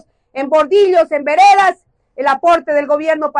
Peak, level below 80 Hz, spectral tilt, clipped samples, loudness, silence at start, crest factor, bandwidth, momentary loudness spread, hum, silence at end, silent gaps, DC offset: -2 dBFS; -56 dBFS; -2.5 dB/octave; under 0.1%; -12 LUFS; 0.35 s; 10 dB; 11 kHz; 9 LU; none; 0 s; none; under 0.1%